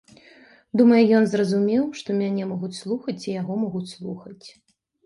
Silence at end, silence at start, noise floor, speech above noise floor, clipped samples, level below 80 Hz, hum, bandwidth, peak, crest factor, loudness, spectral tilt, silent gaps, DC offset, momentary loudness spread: 0.55 s; 0.75 s; -52 dBFS; 30 dB; under 0.1%; -68 dBFS; none; 11 kHz; -6 dBFS; 18 dB; -22 LUFS; -7 dB/octave; none; under 0.1%; 18 LU